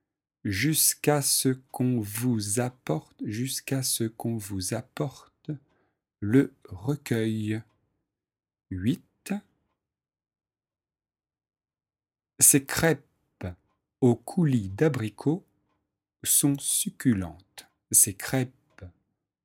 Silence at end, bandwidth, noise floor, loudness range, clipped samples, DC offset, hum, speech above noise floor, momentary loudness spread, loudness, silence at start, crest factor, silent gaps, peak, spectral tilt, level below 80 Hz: 0.55 s; 17.5 kHz; under -90 dBFS; 13 LU; under 0.1%; under 0.1%; none; over 64 dB; 15 LU; -26 LUFS; 0.45 s; 24 dB; none; -4 dBFS; -4 dB/octave; -60 dBFS